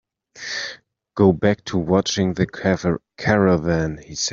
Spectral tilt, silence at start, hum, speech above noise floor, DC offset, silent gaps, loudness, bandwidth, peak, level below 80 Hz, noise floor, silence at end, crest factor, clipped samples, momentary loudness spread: -5.5 dB/octave; 0.35 s; none; 22 dB; under 0.1%; none; -20 LUFS; 7.6 kHz; -2 dBFS; -48 dBFS; -41 dBFS; 0 s; 18 dB; under 0.1%; 11 LU